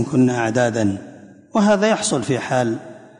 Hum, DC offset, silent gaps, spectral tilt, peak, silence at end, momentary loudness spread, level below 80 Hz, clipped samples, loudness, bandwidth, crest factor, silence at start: none; under 0.1%; none; -5 dB/octave; -6 dBFS; 0.15 s; 8 LU; -54 dBFS; under 0.1%; -19 LUFS; 11 kHz; 14 dB; 0 s